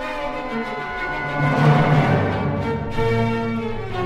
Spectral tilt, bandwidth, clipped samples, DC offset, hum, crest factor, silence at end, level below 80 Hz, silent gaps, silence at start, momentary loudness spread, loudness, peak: -7.5 dB/octave; 8.6 kHz; under 0.1%; under 0.1%; none; 16 dB; 0 s; -36 dBFS; none; 0 s; 10 LU; -21 LUFS; -4 dBFS